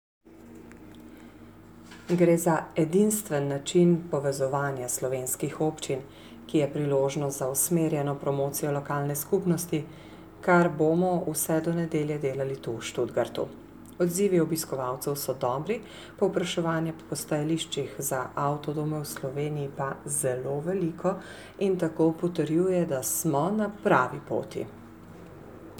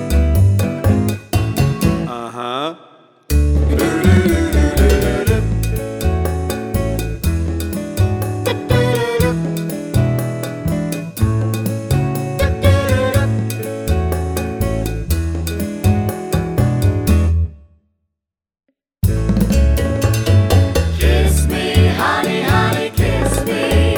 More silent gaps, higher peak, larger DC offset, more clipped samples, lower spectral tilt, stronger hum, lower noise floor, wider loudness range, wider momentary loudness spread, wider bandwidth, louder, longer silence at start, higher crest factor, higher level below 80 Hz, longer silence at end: neither; second, -8 dBFS vs 0 dBFS; neither; neither; about the same, -5.5 dB/octave vs -6 dB/octave; neither; second, -49 dBFS vs -82 dBFS; about the same, 4 LU vs 4 LU; first, 19 LU vs 8 LU; about the same, over 20 kHz vs over 20 kHz; second, -28 LUFS vs -17 LUFS; first, 0.25 s vs 0 s; about the same, 20 dB vs 16 dB; second, -60 dBFS vs -22 dBFS; about the same, 0 s vs 0 s